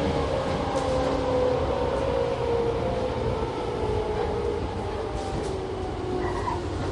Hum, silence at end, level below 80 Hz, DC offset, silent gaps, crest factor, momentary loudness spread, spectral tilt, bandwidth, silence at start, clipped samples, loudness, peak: none; 0 s; -36 dBFS; under 0.1%; none; 14 dB; 6 LU; -6.5 dB/octave; 11.5 kHz; 0 s; under 0.1%; -27 LUFS; -12 dBFS